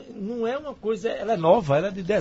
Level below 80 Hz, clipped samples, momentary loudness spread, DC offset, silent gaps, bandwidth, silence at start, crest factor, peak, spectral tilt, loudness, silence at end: -54 dBFS; under 0.1%; 9 LU; under 0.1%; none; 8 kHz; 0 s; 18 dB; -6 dBFS; -7 dB/octave; -24 LUFS; 0 s